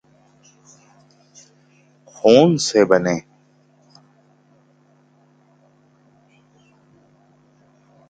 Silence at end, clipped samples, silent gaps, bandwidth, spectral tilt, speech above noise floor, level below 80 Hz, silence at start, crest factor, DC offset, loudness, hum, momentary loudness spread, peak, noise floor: 4.9 s; under 0.1%; none; 9.4 kHz; -5 dB/octave; 42 dB; -64 dBFS; 2.25 s; 22 dB; under 0.1%; -16 LUFS; 50 Hz at -50 dBFS; 10 LU; 0 dBFS; -56 dBFS